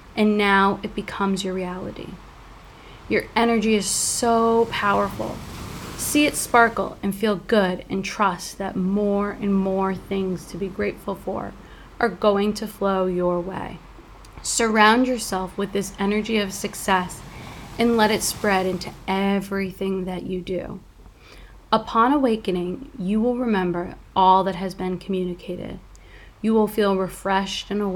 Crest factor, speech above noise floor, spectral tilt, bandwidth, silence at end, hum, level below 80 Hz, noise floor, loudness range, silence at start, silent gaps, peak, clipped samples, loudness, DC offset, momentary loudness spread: 22 dB; 24 dB; -4.5 dB/octave; 19 kHz; 0 s; none; -46 dBFS; -46 dBFS; 4 LU; 0 s; none; -2 dBFS; under 0.1%; -22 LUFS; under 0.1%; 14 LU